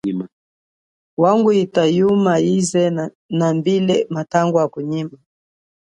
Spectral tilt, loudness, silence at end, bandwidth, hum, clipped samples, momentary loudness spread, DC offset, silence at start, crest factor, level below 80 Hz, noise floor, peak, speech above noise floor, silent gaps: -6 dB/octave; -17 LUFS; 0.8 s; 11 kHz; none; under 0.1%; 11 LU; under 0.1%; 0.05 s; 16 dB; -62 dBFS; under -90 dBFS; -2 dBFS; over 73 dB; 0.33-1.17 s, 3.15-3.29 s